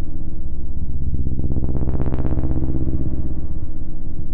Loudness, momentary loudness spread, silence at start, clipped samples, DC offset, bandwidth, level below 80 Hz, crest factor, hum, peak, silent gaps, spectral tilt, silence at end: -26 LUFS; 8 LU; 0 s; under 0.1%; under 0.1%; 1.5 kHz; -22 dBFS; 6 dB; none; -6 dBFS; none; -12 dB/octave; 0 s